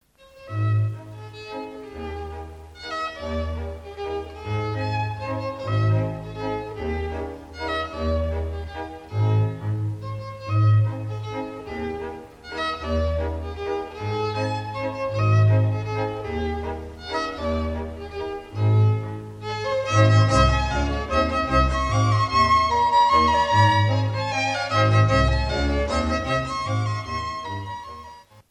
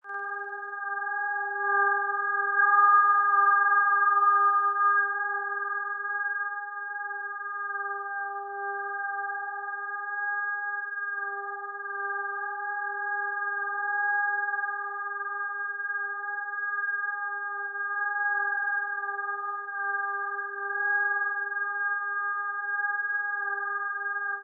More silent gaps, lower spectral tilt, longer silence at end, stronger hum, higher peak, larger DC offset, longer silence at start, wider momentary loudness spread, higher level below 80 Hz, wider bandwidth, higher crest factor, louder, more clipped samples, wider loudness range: neither; first, -6 dB/octave vs 15.5 dB/octave; first, 0.3 s vs 0 s; neither; first, -4 dBFS vs -12 dBFS; neither; first, 0.35 s vs 0.05 s; first, 16 LU vs 12 LU; first, -34 dBFS vs under -90 dBFS; first, 9.2 kHz vs 1.9 kHz; about the same, 18 dB vs 18 dB; first, -23 LUFS vs -27 LUFS; neither; about the same, 10 LU vs 10 LU